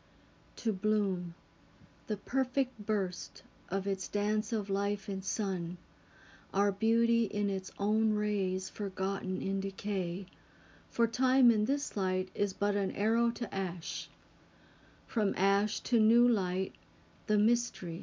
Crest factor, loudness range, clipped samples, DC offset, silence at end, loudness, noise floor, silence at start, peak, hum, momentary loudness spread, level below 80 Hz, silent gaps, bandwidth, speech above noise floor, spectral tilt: 18 dB; 4 LU; under 0.1%; under 0.1%; 0 s; -32 LUFS; -62 dBFS; 0.55 s; -16 dBFS; none; 11 LU; -70 dBFS; none; 7.6 kHz; 31 dB; -5.5 dB/octave